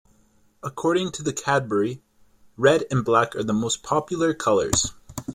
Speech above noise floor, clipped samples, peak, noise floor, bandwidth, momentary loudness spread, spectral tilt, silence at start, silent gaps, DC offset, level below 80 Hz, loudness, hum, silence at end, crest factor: 38 dB; under 0.1%; -4 dBFS; -60 dBFS; 16.5 kHz; 9 LU; -4 dB/octave; 0.65 s; none; under 0.1%; -50 dBFS; -23 LUFS; none; 0 s; 20 dB